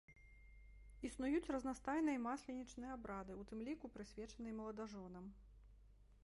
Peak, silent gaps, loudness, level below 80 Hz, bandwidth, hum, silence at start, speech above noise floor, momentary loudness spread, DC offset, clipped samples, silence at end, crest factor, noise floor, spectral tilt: -30 dBFS; none; -47 LUFS; -64 dBFS; 11.5 kHz; none; 0.1 s; 20 dB; 24 LU; under 0.1%; under 0.1%; 0.05 s; 18 dB; -66 dBFS; -5.5 dB/octave